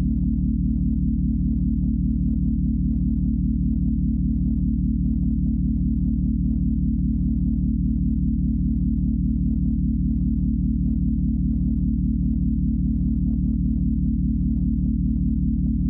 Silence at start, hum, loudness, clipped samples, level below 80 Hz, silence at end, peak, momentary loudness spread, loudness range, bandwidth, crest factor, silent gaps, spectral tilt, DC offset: 0 s; none; -23 LUFS; under 0.1%; -24 dBFS; 0 s; -12 dBFS; 0 LU; 0 LU; 0.8 kHz; 8 dB; none; -16.5 dB/octave; under 0.1%